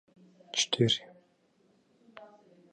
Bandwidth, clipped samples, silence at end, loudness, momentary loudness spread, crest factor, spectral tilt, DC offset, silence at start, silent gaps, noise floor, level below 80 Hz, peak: 10 kHz; under 0.1%; 0.5 s; -29 LUFS; 27 LU; 24 dB; -3.5 dB/octave; under 0.1%; 0.55 s; none; -69 dBFS; -72 dBFS; -12 dBFS